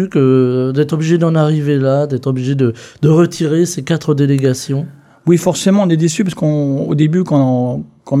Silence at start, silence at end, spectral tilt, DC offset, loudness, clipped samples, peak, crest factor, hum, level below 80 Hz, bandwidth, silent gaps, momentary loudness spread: 0 s; 0 s; -7 dB/octave; under 0.1%; -14 LUFS; under 0.1%; 0 dBFS; 12 dB; none; -54 dBFS; 13.5 kHz; none; 6 LU